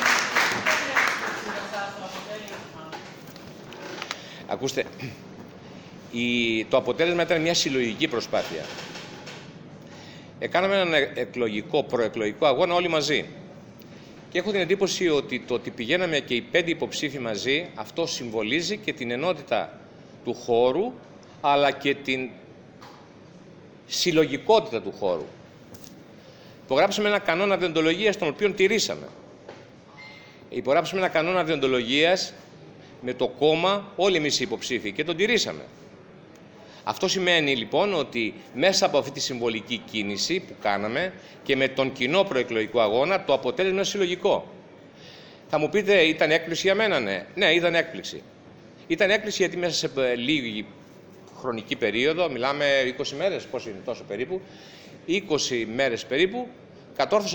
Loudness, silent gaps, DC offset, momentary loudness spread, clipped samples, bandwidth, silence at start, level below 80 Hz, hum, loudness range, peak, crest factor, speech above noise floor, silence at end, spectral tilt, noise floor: -24 LUFS; none; under 0.1%; 19 LU; under 0.1%; over 20 kHz; 0 s; -62 dBFS; none; 4 LU; -6 dBFS; 20 dB; 24 dB; 0 s; -3.5 dB/octave; -48 dBFS